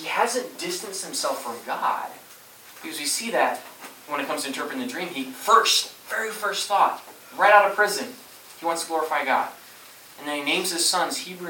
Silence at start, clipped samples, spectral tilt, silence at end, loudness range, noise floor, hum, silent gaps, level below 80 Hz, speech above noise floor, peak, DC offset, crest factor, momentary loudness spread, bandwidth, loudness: 0 s; under 0.1%; -1 dB/octave; 0 s; 7 LU; -47 dBFS; none; none; -80 dBFS; 23 dB; -2 dBFS; under 0.1%; 24 dB; 20 LU; 17.5 kHz; -23 LUFS